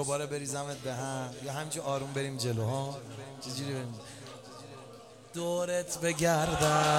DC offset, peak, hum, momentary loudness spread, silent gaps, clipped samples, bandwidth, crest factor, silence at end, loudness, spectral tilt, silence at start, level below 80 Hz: under 0.1%; -12 dBFS; none; 19 LU; none; under 0.1%; 16.5 kHz; 20 dB; 0 s; -33 LUFS; -4 dB/octave; 0 s; -58 dBFS